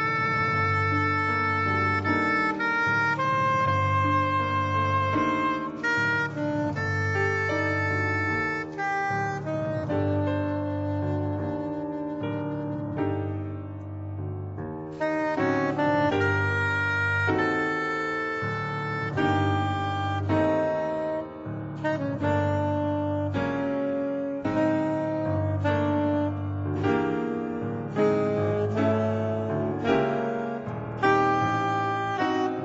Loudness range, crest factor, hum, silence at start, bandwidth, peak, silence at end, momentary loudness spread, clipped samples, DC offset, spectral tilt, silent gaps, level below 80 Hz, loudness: 5 LU; 16 dB; none; 0 s; 8 kHz; -10 dBFS; 0 s; 8 LU; under 0.1%; under 0.1%; -7 dB/octave; none; -58 dBFS; -26 LUFS